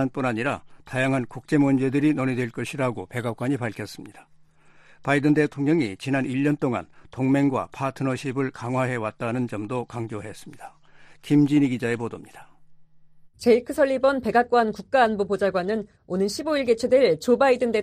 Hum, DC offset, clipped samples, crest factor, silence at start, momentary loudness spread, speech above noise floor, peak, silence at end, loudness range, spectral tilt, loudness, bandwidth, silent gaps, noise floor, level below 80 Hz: none; under 0.1%; under 0.1%; 18 dB; 0 s; 12 LU; 30 dB; -6 dBFS; 0 s; 5 LU; -6.5 dB/octave; -24 LUFS; 14 kHz; none; -53 dBFS; -58 dBFS